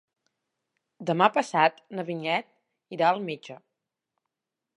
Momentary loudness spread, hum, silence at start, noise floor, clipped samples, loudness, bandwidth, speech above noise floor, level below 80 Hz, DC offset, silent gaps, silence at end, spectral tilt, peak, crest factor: 15 LU; none; 1 s; -86 dBFS; under 0.1%; -26 LUFS; 11 kHz; 60 dB; -84 dBFS; under 0.1%; none; 1.2 s; -5 dB/octave; -4 dBFS; 26 dB